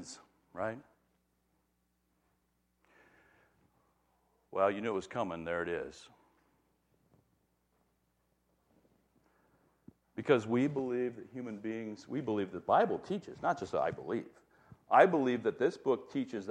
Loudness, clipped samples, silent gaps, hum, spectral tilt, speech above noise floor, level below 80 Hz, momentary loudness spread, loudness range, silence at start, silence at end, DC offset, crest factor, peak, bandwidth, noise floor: -34 LUFS; under 0.1%; none; none; -6.5 dB/octave; 45 dB; -74 dBFS; 14 LU; 15 LU; 0 s; 0 s; under 0.1%; 26 dB; -10 dBFS; 10.5 kHz; -78 dBFS